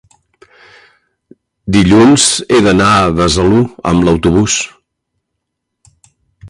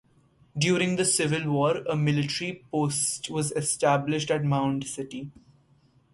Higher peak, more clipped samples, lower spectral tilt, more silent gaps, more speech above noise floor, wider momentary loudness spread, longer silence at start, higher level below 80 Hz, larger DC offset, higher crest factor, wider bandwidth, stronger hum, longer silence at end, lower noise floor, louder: first, 0 dBFS vs -10 dBFS; neither; about the same, -4.5 dB/octave vs -4.5 dB/octave; neither; first, 64 dB vs 36 dB; second, 7 LU vs 11 LU; first, 1.65 s vs 0.55 s; first, -32 dBFS vs -62 dBFS; neither; second, 12 dB vs 18 dB; about the same, 11.5 kHz vs 11.5 kHz; neither; second, 0 s vs 0.8 s; first, -73 dBFS vs -62 dBFS; first, -10 LUFS vs -26 LUFS